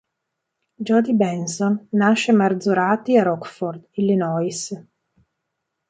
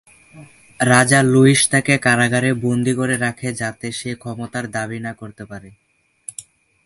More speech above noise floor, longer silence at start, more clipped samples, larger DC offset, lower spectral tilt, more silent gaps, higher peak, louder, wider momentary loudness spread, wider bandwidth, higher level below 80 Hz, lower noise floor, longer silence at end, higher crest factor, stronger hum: first, 60 dB vs 23 dB; first, 0.8 s vs 0.35 s; neither; neither; about the same, -5.5 dB/octave vs -4.5 dB/octave; neither; second, -4 dBFS vs 0 dBFS; second, -20 LUFS vs -17 LUFS; second, 12 LU vs 22 LU; second, 9.4 kHz vs 11.5 kHz; second, -68 dBFS vs -54 dBFS; first, -79 dBFS vs -41 dBFS; first, 1.1 s vs 0.45 s; about the same, 16 dB vs 18 dB; neither